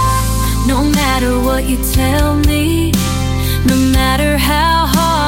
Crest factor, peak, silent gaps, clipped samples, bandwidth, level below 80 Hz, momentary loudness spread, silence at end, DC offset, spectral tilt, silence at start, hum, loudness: 12 dB; 0 dBFS; none; under 0.1%; 17 kHz; -18 dBFS; 3 LU; 0 s; under 0.1%; -5 dB/octave; 0 s; none; -13 LUFS